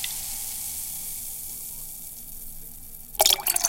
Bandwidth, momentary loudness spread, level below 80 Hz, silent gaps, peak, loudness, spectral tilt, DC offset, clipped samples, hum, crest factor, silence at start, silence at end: 17 kHz; 19 LU; -46 dBFS; none; -4 dBFS; -27 LUFS; 1 dB/octave; under 0.1%; under 0.1%; none; 24 dB; 0 s; 0 s